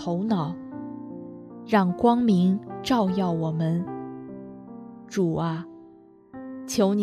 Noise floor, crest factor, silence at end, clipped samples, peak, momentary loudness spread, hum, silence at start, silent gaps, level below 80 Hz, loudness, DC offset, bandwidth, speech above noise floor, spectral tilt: -51 dBFS; 20 dB; 0 s; under 0.1%; -6 dBFS; 21 LU; none; 0 s; none; -62 dBFS; -25 LUFS; under 0.1%; 13.5 kHz; 28 dB; -7 dB/octave